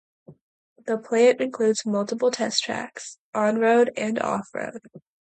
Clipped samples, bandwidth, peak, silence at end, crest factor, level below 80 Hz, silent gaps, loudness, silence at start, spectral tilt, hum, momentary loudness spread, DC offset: under 0.1%; 9.2 kHz; -8 dBFS; 0.25 s; 16 dB; -74 dBFS; 0.41-0.76 s, 3.18-3.33 s; -23 LUFS; 0.3 s; -3.5 dB/octave; none; 16 LU; under 0.1%